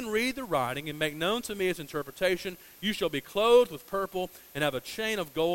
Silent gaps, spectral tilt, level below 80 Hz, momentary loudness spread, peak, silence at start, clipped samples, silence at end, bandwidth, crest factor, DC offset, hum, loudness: none; -4 dB/octave; -58 dBFS; 11 LU; -10 dBFS; 0 s; under 0.1%; 0 s; 16.5 kHz; 20 dB; under 0.1%; none; -29 LUFS